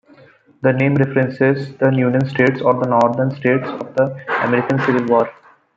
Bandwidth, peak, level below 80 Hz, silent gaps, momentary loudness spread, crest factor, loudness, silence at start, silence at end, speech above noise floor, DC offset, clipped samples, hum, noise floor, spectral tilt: 7.4 kHz; -2 dBFS; -60 dBFS; none; 5 LU; 16 dB; -17 LUFS; 0.65 s; 0.45 s; 32 dB; under 0.1%; under 0.1%; none; -48 dBFS; -8.5 dB/octave